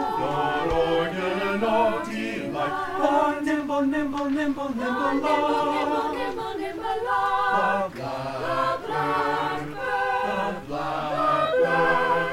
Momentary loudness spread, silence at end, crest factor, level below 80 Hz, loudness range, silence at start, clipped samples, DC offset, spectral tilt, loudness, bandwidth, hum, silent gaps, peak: 7 LU; 0 s; 16 dB; -50 dBFS; 2 LU; 0 s; under 0.1%; under 0.1%; -5.5 dB/octave; -25 LUFS; 16 kHz; none; none; -8 dBFS